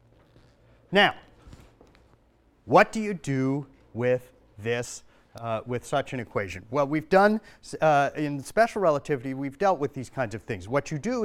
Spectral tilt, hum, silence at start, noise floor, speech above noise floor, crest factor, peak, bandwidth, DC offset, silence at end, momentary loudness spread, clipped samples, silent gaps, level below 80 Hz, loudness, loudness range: -5.5 dB/octave; none; 0.9 s; -62 dBFS; 37 dB; 22 dB; -4 dBFS; 15.5 kHz; under 0.1%; 0 s; 12 LU; under 0.1%; none; -58 dBFS; -26 LUFS; 6 LU